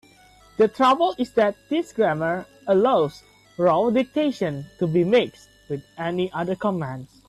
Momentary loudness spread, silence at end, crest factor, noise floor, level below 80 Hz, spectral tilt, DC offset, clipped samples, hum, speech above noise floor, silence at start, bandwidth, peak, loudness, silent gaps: 12 LU; 0.25 s; 14 dB; -53 dBFS; -60 dBFS; -7 dB/octave; under 0.1%; under 0.1%; none; 31 dB; 0.6 s; 13 kHz; -8 dBFS; -22 LUFS; none